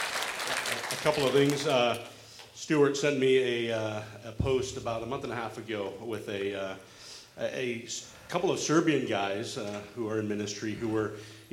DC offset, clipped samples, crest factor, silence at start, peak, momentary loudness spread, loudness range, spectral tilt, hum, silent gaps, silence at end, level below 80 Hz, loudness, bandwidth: under 0.1%; under 0.1%; 20 dB; 0 s; -10 dBFS; 14 LU; 8 LU; -4.5 dB/octave; none; none; 0.05 s; -56 dBFS; -30 LUFS; 16.5 kHz